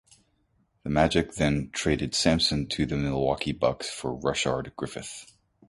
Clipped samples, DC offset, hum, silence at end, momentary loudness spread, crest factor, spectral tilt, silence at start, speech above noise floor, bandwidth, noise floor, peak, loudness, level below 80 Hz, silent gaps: under 0.1%; under 0.1%; none; 0.45 s; 12 LU; 20 dB; -4.5 dB/octave; 0.85 s; 43 dB; 11.5 kHz; -69 dBFS; -6 dBFS; -27 LUFS; -44 dBFS; none